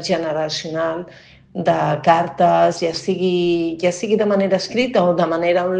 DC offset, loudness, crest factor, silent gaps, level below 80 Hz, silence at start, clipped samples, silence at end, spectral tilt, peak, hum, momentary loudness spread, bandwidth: under 0.1%; -18 LUFS; 18 dB; none; -56 dBFS; 0 s; under 0.1%; 0 s; -5.5 dB/octave; 0 dBFS; none; 7 LU; 9.6 kHz